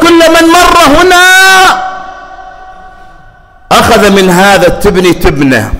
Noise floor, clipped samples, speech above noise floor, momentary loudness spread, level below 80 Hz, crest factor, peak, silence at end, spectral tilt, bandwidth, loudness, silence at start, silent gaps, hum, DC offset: -35 dBFS; 1%; 31 dB; 7 LU; -24 dBFS; 6 dB; 0 dBFS; 0 s; -3.5 dB/octave; 16.5 kHz; -3 LUFS; 0 s; none; none; under 0.1%